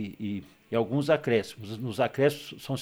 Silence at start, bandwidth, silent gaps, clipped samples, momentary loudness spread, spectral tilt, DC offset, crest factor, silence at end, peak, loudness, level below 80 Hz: 0 s; over 20 kHz; none; under 0.1%; 13 LU; -6.5 dB/octave; under 0.1%; 18 dB; 0 s; -10 dBFS; -29 LUFS; -66 dBFS